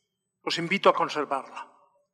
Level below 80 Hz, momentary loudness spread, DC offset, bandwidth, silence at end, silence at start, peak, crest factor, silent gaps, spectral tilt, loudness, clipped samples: -82 dBFS; 18 LU; under 0.1%; 12.5 kHz; 0.5 s; 0.45 s; -6 dBFS; 22 dB; none; -4 dB/octave; -26 LUFS; under 0.1%